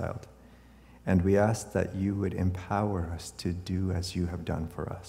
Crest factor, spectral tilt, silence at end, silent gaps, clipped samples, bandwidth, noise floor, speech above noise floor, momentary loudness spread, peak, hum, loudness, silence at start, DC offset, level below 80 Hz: 18 dB; -6.5 dB/octave; 0 s; none; under 0.1%; 15 kHz; -54 dBFS; 24 dB; 12 LU; -12 dBFS; none; -31 LUFS; 0 s; under 0.1%; -48 dBFS